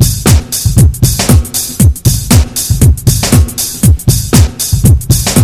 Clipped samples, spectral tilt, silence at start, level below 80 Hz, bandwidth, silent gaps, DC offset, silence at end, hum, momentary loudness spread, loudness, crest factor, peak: 4%; -4.5 dB/octave; 0 s; -14 dBFS; over 20 kHz; none; under 0.1%; 0 s; none; 3 LU; -9 LUFS; 8 dB; 0 dBFS